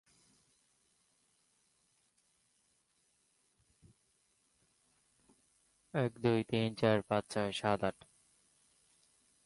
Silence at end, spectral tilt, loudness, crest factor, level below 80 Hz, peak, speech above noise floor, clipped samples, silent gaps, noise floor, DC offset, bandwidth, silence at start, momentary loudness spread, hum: 1.55 s; -6 dB/octave; -35 LUFS; 22 dB; -72 dBFS; -18 dBFS; 43 dB; under 0.1%; none; -77 dBFS; under 0.1%; 11.5 kHz; 5.95 s; 6 LU; none